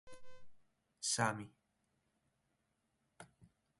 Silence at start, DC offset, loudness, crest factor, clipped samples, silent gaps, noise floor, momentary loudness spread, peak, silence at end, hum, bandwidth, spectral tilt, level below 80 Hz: 0.05 s; under 0.1%; -38 LUFS; 26 dB; under 0.1%; none; -83 dBFS; 26 LU; -20 dBFS; 0.35 s; none; 11.5 kHz; -2.5 dB/octave; -78 dBFS